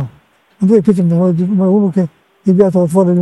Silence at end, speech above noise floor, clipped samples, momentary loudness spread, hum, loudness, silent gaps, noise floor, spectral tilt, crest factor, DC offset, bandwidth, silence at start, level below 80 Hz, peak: 0 s; 38 dB; 0.2%; 8 LU; none; -12 LUFS; none; -49 dBFS; -10 dB/octave; 12 dB; under 0.1%; 12 kHz; 0 s; -52 dBFS; 0 dBFS